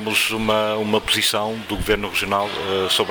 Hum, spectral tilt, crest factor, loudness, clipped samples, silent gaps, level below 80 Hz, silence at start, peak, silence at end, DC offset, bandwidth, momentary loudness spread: none; -3 dB/octave; 16 dB; -20 LUFS; under 0.1%; none; -40 dBFS; 0 s; -6 dBFS; 0 s; under 0.1%; over 20 kHz; 5 LU